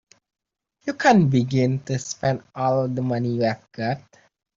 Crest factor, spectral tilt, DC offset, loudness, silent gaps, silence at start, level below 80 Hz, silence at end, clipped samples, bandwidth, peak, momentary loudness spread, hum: 20 dB; -6.5 dB/octave; under 0.1%; -22 LUFS; none; 0.85 s; -60 dBFS; 0.55 s; under 0.1%; 7.6 kHz; -2 dBFS; 11 LU; none